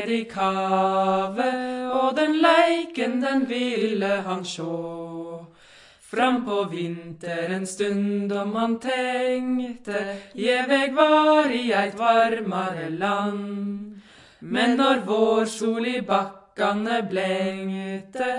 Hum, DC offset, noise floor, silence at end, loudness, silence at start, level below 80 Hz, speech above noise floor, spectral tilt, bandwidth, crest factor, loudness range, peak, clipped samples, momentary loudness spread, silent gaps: none; under 0.1%; -51 dBFS; 0 s; -23 LUFS; 0 s; -68 dBFS; 28 dB; -5 dB/octave; 11.5 kHz; 20 dB; 6 LU; -4 dBFS; under 0.1%; 12 LU; none